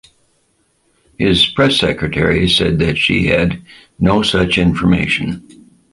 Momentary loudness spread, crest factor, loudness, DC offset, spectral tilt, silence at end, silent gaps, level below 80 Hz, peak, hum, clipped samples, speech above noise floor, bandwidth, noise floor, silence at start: 7 LU; 16 dB; -14 LUFS; under 0.1%; -5.5 dB/octave; 0.5 s; none; -32 dBFS; 0 dBFS; none; under 0.1%; 46 dB; 11.5 kHz; -60 dBFS; 1.2 s